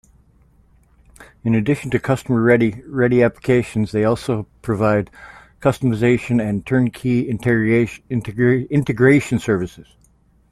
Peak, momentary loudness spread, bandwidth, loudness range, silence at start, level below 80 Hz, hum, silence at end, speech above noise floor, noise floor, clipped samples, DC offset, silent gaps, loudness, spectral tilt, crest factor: -2 dBFS; 7 LU; 13.5 kHz; 2 LU; 1.2 s; -46 dBFS; none; 0.7 s; 38 dB; -55 dBFS; under 0.1%; under 0.1%; none; -18 LUFS; -7.5 dB/octave; 18 dB